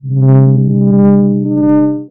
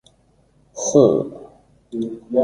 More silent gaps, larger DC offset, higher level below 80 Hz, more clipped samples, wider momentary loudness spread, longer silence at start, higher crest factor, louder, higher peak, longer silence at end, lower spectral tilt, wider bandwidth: neither; first, 1% vs under 0.1%; about the same, -56 dBFS vs -58 dBFS; neither; second, 4 LU vs 22 LU; second, 0.05 s vs 0.75 s; second, 8 dB vs 20 dB; first, -9 LUFS vs -19 LUFS; about the same, 0 dBFS vs -2 dBFS; about the same, 0.05 s vs 0 s; first, -15 dB/octave vs -6.5 dB/octave; second, 2.3 kHz vs 11 kHz